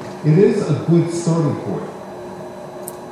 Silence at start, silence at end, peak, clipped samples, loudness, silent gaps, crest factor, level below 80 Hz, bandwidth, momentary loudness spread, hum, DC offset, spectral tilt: 0 s; 0 s; -2 dBFS; under 0.1%; -17 LUFS; none; 16 dB; -58 dBFS; 14 kHz; 18 LU; none; under 0.1%; -7.5 dB/octave